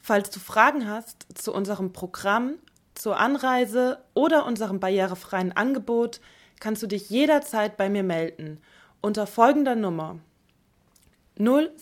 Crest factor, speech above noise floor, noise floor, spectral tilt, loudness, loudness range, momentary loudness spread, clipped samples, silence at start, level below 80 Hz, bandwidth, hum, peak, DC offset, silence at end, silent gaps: 22 dB; 40 dB; -64 dBFS; -5 dB/octave; -24 LUFS; 2 LU; 13 LU; under 0.1%; 0.05 s; -66 dBFS; 17.5 kHz; none; -2 dBFS; under 0.1%; 0.05 s; none